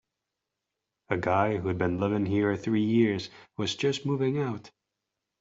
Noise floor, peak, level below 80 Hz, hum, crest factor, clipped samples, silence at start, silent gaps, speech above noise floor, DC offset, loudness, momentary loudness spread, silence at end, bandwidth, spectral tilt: -86 dBFS; -8 dBFS; -64 dBFS; none; 20 dB; under 0.1%; 1.1 s; none; 59 dB; under 0.1%; -28 LUFS; 9 LU; 0.7 s; 7.8 kHz; -6.5 dB/octave